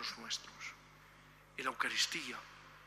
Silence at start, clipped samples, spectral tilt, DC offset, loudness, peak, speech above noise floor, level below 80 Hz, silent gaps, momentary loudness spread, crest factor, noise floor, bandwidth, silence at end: 0 s; under 0.1%; 0 dB/octave; under 0.1%; -39 LUFS; -20 dBFS; 20 dB; -72 dBFS; none; 25 LU; 22 dB; -61 dBFS; 15.5 kHz; 0 s